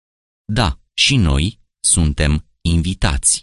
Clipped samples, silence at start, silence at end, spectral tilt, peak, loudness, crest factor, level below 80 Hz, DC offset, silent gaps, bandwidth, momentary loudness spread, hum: under 0.1%; 0.5 s; 0 s; -3.5 dB/octave; -2 dBFS; -17 LUFS; 16 dB; -24 dBFS; under 0.1%; none; 11.5 kHz; 7 LU; none